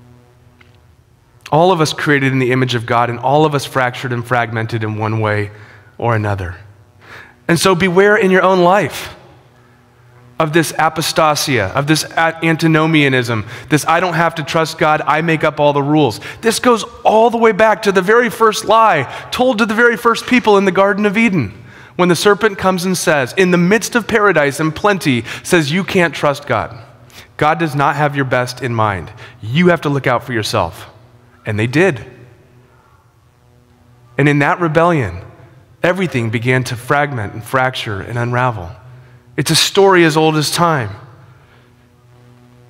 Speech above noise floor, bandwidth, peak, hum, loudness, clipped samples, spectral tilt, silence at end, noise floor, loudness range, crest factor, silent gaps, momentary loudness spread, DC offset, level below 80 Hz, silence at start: 37 dB; 16.5 kHz; 0 dBFS; none; -14 LUFS; under 0.1%; -5 dB/octave; 1.65 s; -50 dBFS; 6 LU; 14 dB; none; 10 LU; under 0.1%; -48 dBFS; 1.45 s